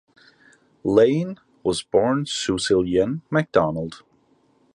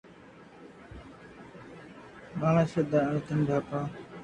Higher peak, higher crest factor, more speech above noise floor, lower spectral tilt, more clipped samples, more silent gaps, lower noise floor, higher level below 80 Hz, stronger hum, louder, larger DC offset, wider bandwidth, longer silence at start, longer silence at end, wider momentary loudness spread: first, -2 dBFS vs -12 dBFS; about the same, 20 dB vs 20 dB; first, 40 dB vs 25 dB; second, -5.5 dB/octave vs -8.5 dB/octave; neither; neither; first, -61 dBFS vs -52 dBFS; first, -52 dBFS vs -58 dBFS; neither; first, -22 LUFS vs -29 LUFS; neither; first, 11 kHz vs 9.2 kHz; first, 0.85 s vs 0.1 s; first, 0.75 s vs 0 s; second, 12 LU vs 23 LU